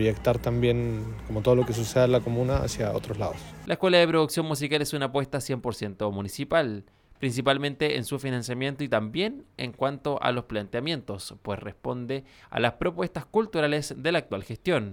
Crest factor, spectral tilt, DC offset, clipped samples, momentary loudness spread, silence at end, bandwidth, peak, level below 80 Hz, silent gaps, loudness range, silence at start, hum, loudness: 18 dB; -5.5 dB/octave; under 0.1%; under 0.1%; 11 LU; 0 s; 18 kHz; -8 dBFS; -46 dBFS; none; 5 LU; 0 s; none; -27 LUFS